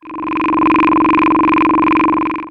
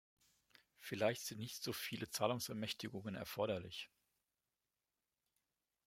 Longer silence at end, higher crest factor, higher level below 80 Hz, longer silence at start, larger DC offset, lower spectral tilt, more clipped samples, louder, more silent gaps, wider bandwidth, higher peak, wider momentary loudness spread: second, 0 s vs 2 s; second, 12 dB vs 26 dB; first, -40 dBFS vs -80 dBFS; second, 0.05 s vs 0.8 s; neither; first, -7.5 dB/octave vs -4 dB/octave; neither; first, -13 LUFS vs -43 LUFS; neither; second, 5.2 kHz vs 16.5 kHz; first, 0 dBFS vs -20 dBFS; second, 6 LU vs 10 LU